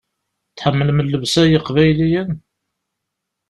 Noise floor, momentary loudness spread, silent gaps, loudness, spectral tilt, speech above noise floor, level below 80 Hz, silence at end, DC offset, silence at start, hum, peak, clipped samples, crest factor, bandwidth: -78 dBFS; 8 LU; none; -16 LUFS; -6 dB/octave; 63 dB; -44 dBFS; 1.1 s; under 0.1%; 0.55 s; none; -2 dBFS; under 0.1%; 16 dB; 12 kHz